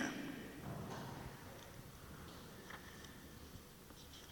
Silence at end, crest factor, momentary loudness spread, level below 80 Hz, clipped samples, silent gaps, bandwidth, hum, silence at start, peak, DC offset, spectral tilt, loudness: 0 s; 22 dB; 8 LU; -64 dBFS; under 0.1%; none; 19 kHz; none; 0 s; -28 dBFS; under 0.1%; -4.5 dB/octave; -52 LUFS